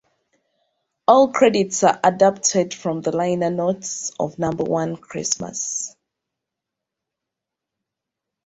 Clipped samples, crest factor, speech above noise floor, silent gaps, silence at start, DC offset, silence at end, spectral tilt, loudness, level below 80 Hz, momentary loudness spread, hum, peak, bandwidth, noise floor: under 0.1%; 20 dB; 65 dB; none; 1.1 s; under 0.1%; 2.55 s; -4 dB/octave; -20 LUFS; -60 dBFS; 11 LU; none; -2 dBFS; 8.2 kHz; -84 dBFS